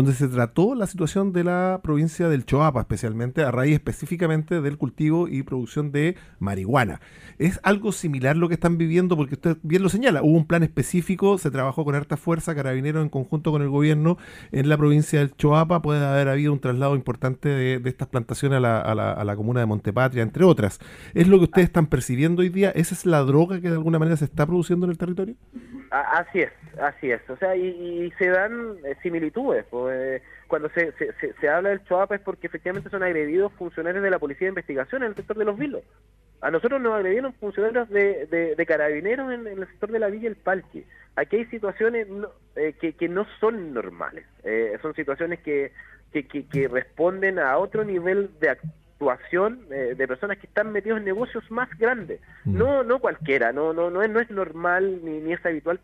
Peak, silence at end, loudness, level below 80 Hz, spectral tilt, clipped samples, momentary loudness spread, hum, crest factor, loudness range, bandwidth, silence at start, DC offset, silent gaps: -2 dBFS; 0.05 s; -23 LUFS; -48 dBFS; -7 dB/octave; under 0.1%; 10 LU; none; 20 dB; 7 LU; 15.5 kHz; 0 s; under 0.1%; none